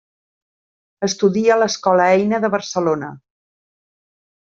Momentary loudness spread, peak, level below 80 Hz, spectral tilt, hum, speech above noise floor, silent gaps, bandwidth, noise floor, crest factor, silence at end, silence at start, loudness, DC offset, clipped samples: 10 LU; -2 dBFS; -64 dBFS; -4.5 dB/octave; none; over 74 dB; none; 7.8 kHz; under -90 dBFS; 18 dB; 1.4 s; 1 s; -17 LUFS; under 0.1%; under 0.1%